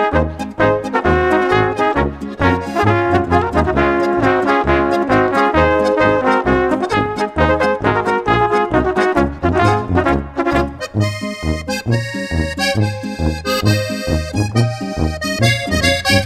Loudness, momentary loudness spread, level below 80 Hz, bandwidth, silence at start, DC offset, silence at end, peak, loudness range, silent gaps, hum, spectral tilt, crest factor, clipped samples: -16 LUFS; 6 LU; -30 dBFS; 15 kHz; 0 s; under 0.1%; 0 s; 0 dBFS; 4 LU; none; none; -6 dB/octave; 16 dB; under 0.1%